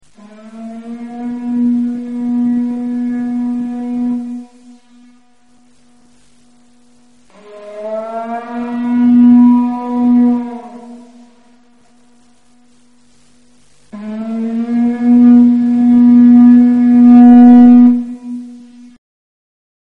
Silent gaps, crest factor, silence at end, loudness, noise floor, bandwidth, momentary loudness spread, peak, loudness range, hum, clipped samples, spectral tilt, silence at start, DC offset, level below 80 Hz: none; 12 dB; 1.3 s; -10 LUFS; -51 dBFS; 3.1 kHz; 23 LU; 0 dBFS; 20 LU; none; under 0.1%; -8.5 dB/octave; 0.45 s; 0.4%; -52 dBFS